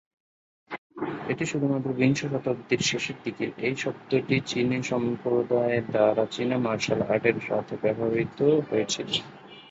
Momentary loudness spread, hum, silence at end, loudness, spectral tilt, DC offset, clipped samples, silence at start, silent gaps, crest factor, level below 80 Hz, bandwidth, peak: 9 LU; none; 0 s; -26 LUFS; -5 dB/octave; under 0.1%; under 0.1%; 0.7 s; 0.78-0.90 s; 20 dB; -62 dBFS; 8 kHz; -8 dBFS